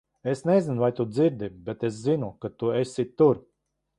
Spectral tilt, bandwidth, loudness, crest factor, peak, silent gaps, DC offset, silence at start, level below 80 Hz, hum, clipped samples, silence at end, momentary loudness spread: -7.5 dB/octave; 11 kHz; -26 LUFS; 18 dB; -8 dBFS; none; under 0.1%; 0.25 s; -62 dBFS; none; under 0.1%; 0.6 s; 10 LU